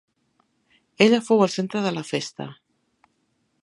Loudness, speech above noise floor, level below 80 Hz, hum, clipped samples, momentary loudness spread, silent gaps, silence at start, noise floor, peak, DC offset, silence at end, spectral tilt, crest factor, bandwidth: -22 LUFS; 49 dB; -74 dBFS; none; under 0.1%; 16 LU; none; 1 s; -70 dBFS; 0 dBFS; under 0.1%; 1.1 s; -5 dB/octave; 24 dB; 11.5 kHz